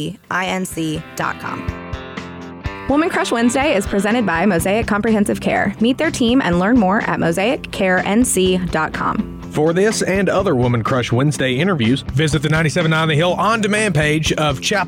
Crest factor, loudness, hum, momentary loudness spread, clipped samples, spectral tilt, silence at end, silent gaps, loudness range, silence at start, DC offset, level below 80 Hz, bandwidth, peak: 10 dB; -17 LUFS; none; 9 LU; under 0.1%; -5 dB/octave; 0 s; none; 3 LU; 0 s; under 0.1%; -38 dBFS; 17 kHz; -6 dBFS